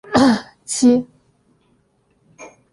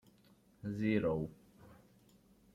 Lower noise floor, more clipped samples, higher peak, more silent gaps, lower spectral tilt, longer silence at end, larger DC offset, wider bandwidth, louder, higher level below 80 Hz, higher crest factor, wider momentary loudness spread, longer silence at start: second, -61 dBFS vs -67 dBFS; neither; first, -2 dBFS vs -20 dBFS; neither; second, -4 dB/octave vs -8.5 dB/octave; second, 0.25 s vs 0.8 s; neither; second, 11.5 kHz vs 14 kHz; first, -17 LUFS vs -37 LUFS; first, -54 dBFS vs -66 dBFS; about the same, 18 dB vs 20 dB; about the same, 11 LU vs 13 LU; second, 0.1 s vs 0.65 s